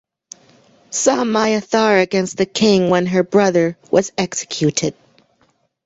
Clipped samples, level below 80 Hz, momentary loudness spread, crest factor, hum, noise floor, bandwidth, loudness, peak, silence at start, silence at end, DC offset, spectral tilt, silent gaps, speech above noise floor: under 0.1%; -56 dBFS; 7 LU; 16 dB; none; -61 dBFS; 8.2 kHz; -16 LUFS; -2 dBFS; 0.9 s; 0.95 s; under 0.1%; -4.5 dB/octave; none; 45 dB